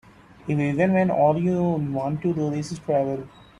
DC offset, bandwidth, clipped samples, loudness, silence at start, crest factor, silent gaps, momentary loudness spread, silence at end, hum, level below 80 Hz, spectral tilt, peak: under 0.1%; 10.5 kHz; under 0.1%; -23 LUFS; 0.45 s; 16 dB; none; 9 LU; 0.3 s; none; -56 dBFS; -8 dB/octave; -8 dBFS